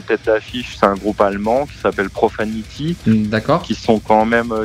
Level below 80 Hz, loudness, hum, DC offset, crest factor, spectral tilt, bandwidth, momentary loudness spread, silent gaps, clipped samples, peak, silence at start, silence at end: -40 dBFS; -17 LUFS; none; under 0.1%; 16 dB; -6.5 dB/octave; 13.5 kHz; 9 LU; none; under 0.1%; 0 dBFS; 0 s; 0 s